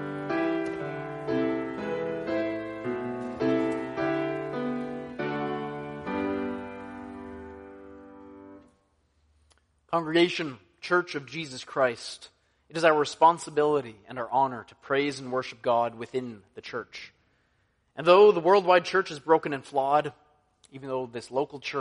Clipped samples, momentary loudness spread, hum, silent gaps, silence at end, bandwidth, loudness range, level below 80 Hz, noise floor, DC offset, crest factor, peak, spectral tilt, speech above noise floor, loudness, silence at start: under 0.1%; 19 LU; none; none; 0 s; 10.5 kHz; 11 LU; -64 dBFS; -70 dBFS; under 0.1%; 22 dB; -6 dBFS; -5.5 dB/octave; 45 dB; -27 LUFS; 0 s